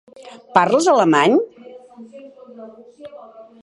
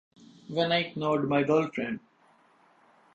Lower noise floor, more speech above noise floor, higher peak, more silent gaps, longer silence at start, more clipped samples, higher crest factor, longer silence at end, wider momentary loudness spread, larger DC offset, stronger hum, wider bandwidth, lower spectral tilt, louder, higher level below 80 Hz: second, -40 dBFS vs -63 dBFS; second, 25 dB vs 36 dB; first, 0 dBFS vs -12 dBFS; neither; about the same, 0.55 s vs 0.5 s; neither; about the same, 20 dB vs 18 dB; second, 0.2 s vs 1.15 s; first, 26 LU vs 11 LU; neither; neither; first, 11.5 kHz vs 8 kHz; second, -4.5 dB/octave vs -6.5 dB/octave; first, -15 LUFS vs -28 LUFS; about the same, -72 dBFS vs -68 dBFS